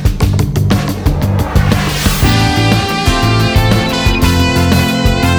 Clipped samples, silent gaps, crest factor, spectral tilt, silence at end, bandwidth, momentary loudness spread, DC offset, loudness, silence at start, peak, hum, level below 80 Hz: under 0.1%; none; 10 dB; -5.5 dB/octave; 0 s; over 20 kHz; 3 LU; under 0.1%; -12 LUFS; 0 s; 0 dBFS; none; -18 dBFS